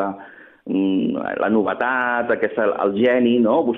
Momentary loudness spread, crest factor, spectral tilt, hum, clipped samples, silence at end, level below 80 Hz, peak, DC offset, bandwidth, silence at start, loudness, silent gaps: 9 LU; 14 dB; -9 dB/octave; none; under 0.1%; 0 s; -60 dBFS; -6 dBFS; under 0.1%; 3.9 kHz; 0 s; -19 LUFS; none